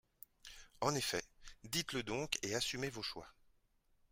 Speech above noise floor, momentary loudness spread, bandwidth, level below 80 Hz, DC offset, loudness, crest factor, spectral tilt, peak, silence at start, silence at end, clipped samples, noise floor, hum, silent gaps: 34 dB; 19 LU; 16 kHz; -64 dBFS; under 0.1%; -40 LUFS; 28 dB; -3 dB/octave; -16 dBFS; 0.45 s; 0.8 s; under 0.1%; -75 dBFS; none; none